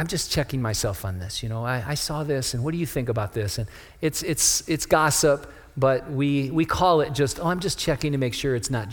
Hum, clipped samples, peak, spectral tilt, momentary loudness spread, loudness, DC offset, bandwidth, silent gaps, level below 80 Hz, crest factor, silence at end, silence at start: none; under 0.1%; -4 dBFS; -4 dB/octave; 9 LU; -24 LUFS; under 0.1%; over 20 kHz; none; -44 dBFS; 20 dB; 0 s; 0 s